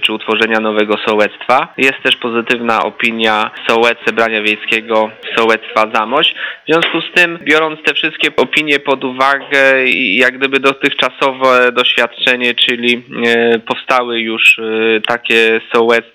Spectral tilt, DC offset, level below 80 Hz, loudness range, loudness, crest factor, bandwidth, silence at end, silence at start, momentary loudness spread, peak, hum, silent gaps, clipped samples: -3.5 dB/octave; under 0.1%; -60 dBFS; 2 LU; -12 LUFS; 12 dB; 16.5 kHz; 0.1 s; 0 s; 5 LU; 0 dBFS; none; none; 0.4%